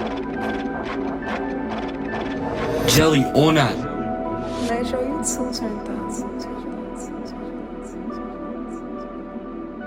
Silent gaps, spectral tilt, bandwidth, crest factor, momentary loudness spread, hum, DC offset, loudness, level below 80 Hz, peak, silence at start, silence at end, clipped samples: none; -4.5 dB/octave; 16.5 kHz; 20 dB; 16 LU; none; under 0.1%; -24 LUFS; -42 dBFS; -4 dBFS; 0 s; 0 s; under 0.1%